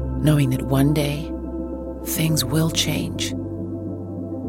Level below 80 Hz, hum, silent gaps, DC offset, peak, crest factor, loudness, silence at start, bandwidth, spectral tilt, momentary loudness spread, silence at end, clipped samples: -36 dBFS; none; none; under 0.1%; -4 dBFS; 18 dB; -22 LUFS; 0 s; 17 kHz; -5 dB/octave; 11 LU; 0 s; under 0.1%